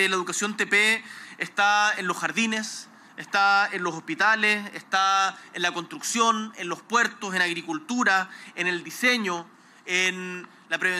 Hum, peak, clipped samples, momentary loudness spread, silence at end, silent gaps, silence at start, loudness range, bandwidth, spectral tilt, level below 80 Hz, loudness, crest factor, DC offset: none; -10 dBFS; under 0.1%; 14 LU; 0 s; none; 0 s; 2 LU; 16 kHz; -2 dB/octave; -82 dBFS; -24 LUFS; 16 dB; under 0.1%